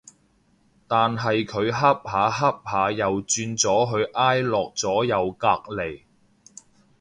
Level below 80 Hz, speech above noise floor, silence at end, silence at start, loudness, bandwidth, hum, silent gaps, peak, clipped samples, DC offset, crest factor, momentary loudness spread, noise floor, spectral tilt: -56 dBFS; 40 dB; 1.05 s; 0.9 s; -23 LUFS; 11 kHz; none; none; -4 dBFS; under 0.1%; under 0.1%; 20 dB; 5 LU; -62 dBFS; -4 dB/octave